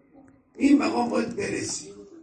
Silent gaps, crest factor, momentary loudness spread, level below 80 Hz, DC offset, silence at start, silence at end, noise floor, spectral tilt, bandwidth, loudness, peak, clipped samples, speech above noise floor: none; 18 dB; 12 LU; -60 dBFS; under 0.1%; 0.55 s; 0.05 s; -55 dBFS; -4 dB/octave; 10 kHz; -25 LUFS; -8 dBFS; under 0.1%; 31 dB